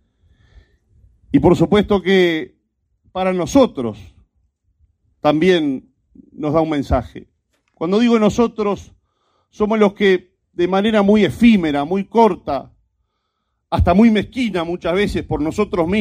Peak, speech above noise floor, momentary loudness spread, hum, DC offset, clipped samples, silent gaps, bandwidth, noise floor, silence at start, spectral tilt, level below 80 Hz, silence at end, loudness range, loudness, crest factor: 0 dBFS; 56 dB; 13 LU; none; under 0.1%; under 0.1%; none; 14 kHz; -72 dBFS; 1.3 s; -6.5 dB/octave; -38 dBFS; 0 s; 4 LU; -17 LUFS; 18 dB